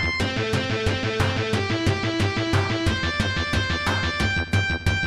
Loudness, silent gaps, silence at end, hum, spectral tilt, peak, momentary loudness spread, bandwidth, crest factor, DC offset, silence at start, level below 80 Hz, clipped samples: -23 LUFS; none; 0 s; none; -5 dB/octave; -8 dBFS; 2 LU; 13 kHz; 16 dB; 0.2%; 0 s; -36 dBFS; under 0.1%